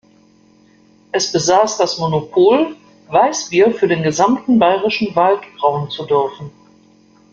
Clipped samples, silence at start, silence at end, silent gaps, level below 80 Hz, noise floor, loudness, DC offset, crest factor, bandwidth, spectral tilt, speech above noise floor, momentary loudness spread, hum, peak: under 0.1%; 1.15 s; 0.85 s; none; -56 dBFS; -50 dBFS; -15 LUFS; under 0.1%; 14 dB; 7.6 kHz; -4.5 dB/octave; 36 dB; 8 LU; none; -2 dBFS